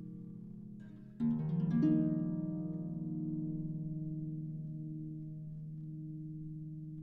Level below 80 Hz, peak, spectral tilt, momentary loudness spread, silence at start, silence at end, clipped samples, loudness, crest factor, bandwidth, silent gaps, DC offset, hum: -64 dBFS; -20 dBFS; -12 dB/octave; 17 LU; 0 s; 0 s; under 0.1%; -39 LUFS; 18 dB; 3.7 kHz; none; under 0.1%; none